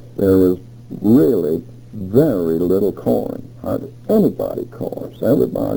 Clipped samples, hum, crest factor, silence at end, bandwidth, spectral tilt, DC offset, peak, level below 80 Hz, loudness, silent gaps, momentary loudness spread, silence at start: under 0.1%; none; 16 dB; 0 s; over 20 kHz; -9.5 dB/octave; under 0.1%; -2 dBFS; -48 dBFS; -17 LUFS; none; 13 LU; 0 s